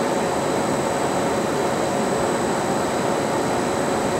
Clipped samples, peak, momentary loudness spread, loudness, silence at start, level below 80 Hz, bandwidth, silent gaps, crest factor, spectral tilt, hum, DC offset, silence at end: under 0.1%; -8 dBFS; 1 LU; -22 LUFS; 0 s; -50 dBFS; 16 kHz; none; 14 dB; -4.5 dB/octave; none; under 0.1%; 0 s